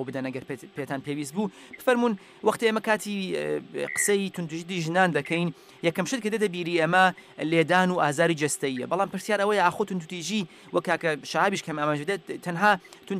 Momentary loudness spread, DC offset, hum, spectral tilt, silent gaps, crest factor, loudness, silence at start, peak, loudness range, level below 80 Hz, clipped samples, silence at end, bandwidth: 10 LU; under 0.1%; none; -4.5 dB/octave; none; 18 dB; -26 LUFS; 0 s; -8 dBFS; 3 LU; -72 dBFS; under 0.1%; 0 s; 15.5 kHz